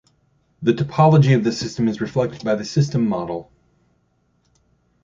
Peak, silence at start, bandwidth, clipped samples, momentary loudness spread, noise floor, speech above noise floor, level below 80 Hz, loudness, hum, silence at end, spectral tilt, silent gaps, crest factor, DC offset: -2 dBFS; 0.6 s; 7.6 kHz; under 0.1%; 10 LU; -64 dBFS; 46 dB; -54 dBFS; -19 LUFS; none; 1.6 s; -7 dB/octave; none; 18 dB; under 0.1%